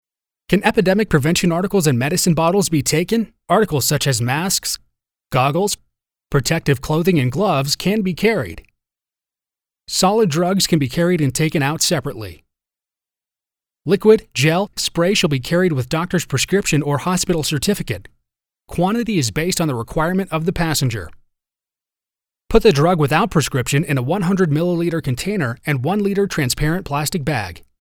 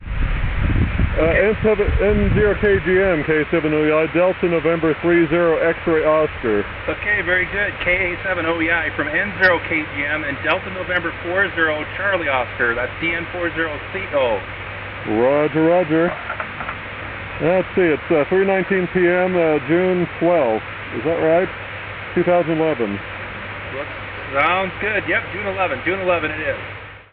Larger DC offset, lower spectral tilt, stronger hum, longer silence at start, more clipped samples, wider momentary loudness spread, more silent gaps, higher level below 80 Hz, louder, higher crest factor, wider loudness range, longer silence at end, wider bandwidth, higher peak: neither; second, -5 dB/octave vs -11 dB/octave; neither; first, 0.5 s vs 0 s; neither; second, 7 LU vs 11 LU; neither; second, -38 dBFS vs -32 dBFS; about the same, -18 LUFS vs -19 LUFS; about the same, 18 dB vs 16 dB; about the same, 3 LU vs 4 LU; first, 0.25 s vs 0.1 s; first, over 20 kHz vs 5.8 kHz; first, 0 dBFS vs -4 dBFS